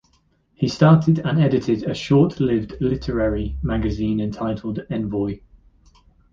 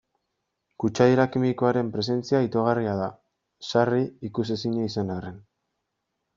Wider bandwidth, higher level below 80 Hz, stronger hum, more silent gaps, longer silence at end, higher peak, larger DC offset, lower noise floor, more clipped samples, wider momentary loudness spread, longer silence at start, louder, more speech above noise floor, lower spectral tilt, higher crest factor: about the same, 7.4 kHz vs 7.6 kHz; first, -36 dBFS vs -62 dBFS; neither; neither; about the same, 0.95 s vs 0.95 s; first, -2 dBFS vs -6 dBFS; neither; second, -62 dBFS vs -80 dBFS; neither; about the same, 11 LU vs 10 LU; second, 0.6 s vs 0.8 s; first, -21 LUFS vs -25 LUFS; second, 43 dB vs 56 dB; first, -8 dB/octave vs -6 dB/octave; about the same, 18 dB vs 20 dB